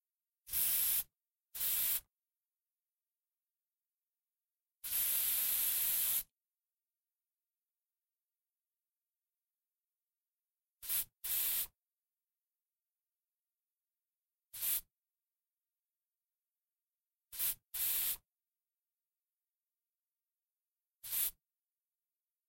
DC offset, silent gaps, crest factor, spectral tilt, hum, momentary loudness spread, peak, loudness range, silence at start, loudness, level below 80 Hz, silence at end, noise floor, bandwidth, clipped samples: under 0.1%; none; 22 dB; 2 dB/octave; none; 16 LU; -22 dBFS; 9 LU; 0.45 s; -34 LUFS; -74 dBFS; 1.2 s; under -90 dBFS; 16.5 kHz; under 0.1%